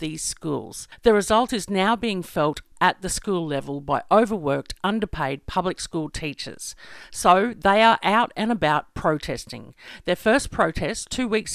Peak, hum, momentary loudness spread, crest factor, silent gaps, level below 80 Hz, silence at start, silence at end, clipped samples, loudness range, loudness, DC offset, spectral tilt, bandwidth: -2 dBFS; none; 14 LU; 20 dB; none; -44 dBFS; 0 s; 0 s; under 0.1%; 4 LU; -23 LUFS; under 0.1%; -4 dB/octave; 15.5 kHz